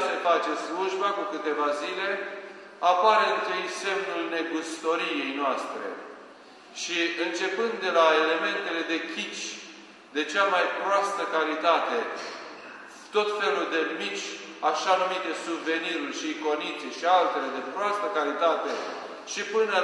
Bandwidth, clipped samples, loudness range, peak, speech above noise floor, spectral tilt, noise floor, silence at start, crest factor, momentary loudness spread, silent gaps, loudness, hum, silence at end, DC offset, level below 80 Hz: 12 kHz; under 0.1%; 3 LU; -6 dBFS; 22 dB; -2 dB/octave; -49 dBFS; 0 s; 22 dB; 13 LU; none; -27 LUFS; none; 0 s; under 0.1%; -84 dBFS